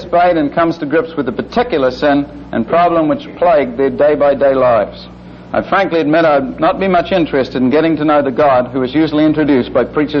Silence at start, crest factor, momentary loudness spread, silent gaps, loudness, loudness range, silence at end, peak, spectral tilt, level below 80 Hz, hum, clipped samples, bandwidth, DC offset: 0 s; 10 dB; 6 LU; none; -13 LUFS; 1 LU; 0 s; -2 dBFS; -8 dB/octave; -40 dBFS; 60 Hz at -45 dBFS; under 0.1%; 6.4 kHz; under 0.1%